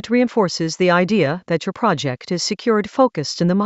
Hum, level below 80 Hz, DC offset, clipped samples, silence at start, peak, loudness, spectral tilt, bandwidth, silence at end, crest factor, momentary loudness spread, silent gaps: none; -60 dBFS; under 0.1%; under 0.1%; 0.05 s; -2 dBFS; -19 LUFS; -5.5 dB/octave; 8.2 kHz; 0 s; 16 dB; 6 LU; none